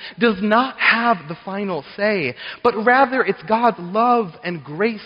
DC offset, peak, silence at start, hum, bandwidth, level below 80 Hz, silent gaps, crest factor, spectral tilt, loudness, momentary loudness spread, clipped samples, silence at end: under 0.1%; -2 dBFS; 0 s; none; 5.4 kHz; -60 dBFS; none; 16 dB; -8 dB/octave; -19 LUFS; 11 LU; under 0.1%; 0 s